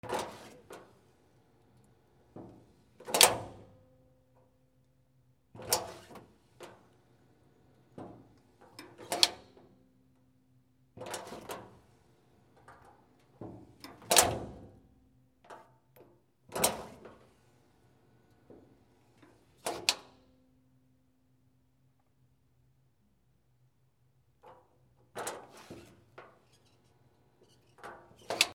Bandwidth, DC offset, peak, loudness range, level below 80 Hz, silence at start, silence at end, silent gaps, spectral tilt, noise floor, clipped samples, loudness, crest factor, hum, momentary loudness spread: 19 kHz; under 0.1%; -2 dBFS; 17 LU; -68 dBFS; 0.05 s; 0 s; none; -1 dB/octave; -72 dBFS; under 0.1%; -30 LUFS; 38 dB; none; 30 LU